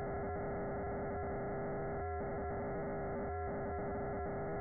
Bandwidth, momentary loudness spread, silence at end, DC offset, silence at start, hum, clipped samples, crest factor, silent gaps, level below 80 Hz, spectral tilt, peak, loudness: 2.3 kHz; 0 LU; 0 s; under 0.1%; 0 s; none; under 0.1%; 6 dB; none; -52 dBFS; -4.5 dB/octave; -34 dBFS; -41 LUFS